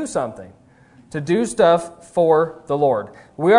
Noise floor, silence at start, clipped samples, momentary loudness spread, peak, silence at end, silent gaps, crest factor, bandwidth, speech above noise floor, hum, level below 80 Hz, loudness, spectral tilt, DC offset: -50 dBFS; 0 s; under 0.1%; 14 LU; 0 dBFS; 0 s; none; 18 dB; 11 kHz; 32 dB; none; -56 dBFS; -19 LUFS; -5.5 dB/octave; under 0.1%